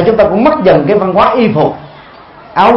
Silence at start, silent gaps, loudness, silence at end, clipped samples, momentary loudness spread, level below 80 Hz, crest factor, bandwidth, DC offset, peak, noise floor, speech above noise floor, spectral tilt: 0 s; none; -9 LUFS; 0 s; 0.4%; 7 LU; -38 dBFS; 10 dB; 6 kHz; under 0.1%; 0 dBFS; -34 dBFS; 26 dB; -8.5 dB/octave